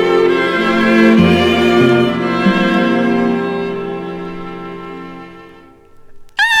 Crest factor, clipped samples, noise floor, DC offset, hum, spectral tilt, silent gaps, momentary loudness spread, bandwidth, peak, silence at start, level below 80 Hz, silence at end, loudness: 14 dB; under 0.1%; -41 dBFS; under 0.1%; none; -6 dB/octave; none; 18 LU; 13.5 kHz; 0 dBFS; 0 s; -44 dBFS; 0 s; -13 LUFS